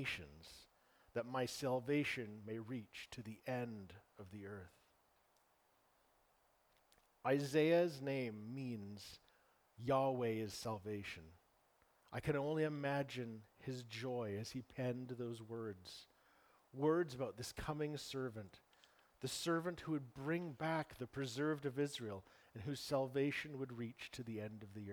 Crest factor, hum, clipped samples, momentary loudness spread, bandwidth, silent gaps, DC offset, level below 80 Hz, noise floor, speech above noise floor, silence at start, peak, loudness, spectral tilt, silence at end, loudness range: 20 dB; none; under 0.1%; 16 LU; over 20 kHz; none; under 0.1%; -72 dBFS; -77 dBFS; 34 dB; 0 s; -24 dBFS; -43 LUFS; -5.5 dB/octave; 0 s; 8 LU